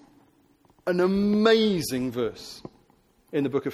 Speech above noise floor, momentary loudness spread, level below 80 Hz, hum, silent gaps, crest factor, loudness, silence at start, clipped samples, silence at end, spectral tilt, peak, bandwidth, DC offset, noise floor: 38 dB; 18 LU; -58 dBFS; none; none; 18 dB; -24 LUFS; 0.85 s; under 0.1%; 0 s; -5.5 dB/octave; -8 dBFS; 14 kHz; under 0.1%; -62 dBFS